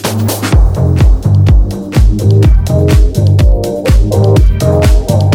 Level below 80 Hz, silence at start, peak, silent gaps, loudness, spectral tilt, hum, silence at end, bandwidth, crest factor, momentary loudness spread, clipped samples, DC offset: -10 dBFS; 0 s; 0 dBFS; none; -10 LUFS; -7 dB/octave; none; 0 s; 16.5 kHz; 8 dB; 3 LU; 0.2%; under 0.1%